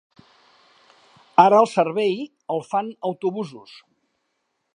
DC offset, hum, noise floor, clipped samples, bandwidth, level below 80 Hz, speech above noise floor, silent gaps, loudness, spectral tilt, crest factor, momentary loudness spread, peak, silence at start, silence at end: under 0.1%; none; -74 dBFS; under 0.1%; 10.5 kHz; -78 dBFS; 54 dB; none; -21 LUFS; -6 dB/octave; 22 dB; 15 LU; 0 dBFS; 1.4 s; 1.15 s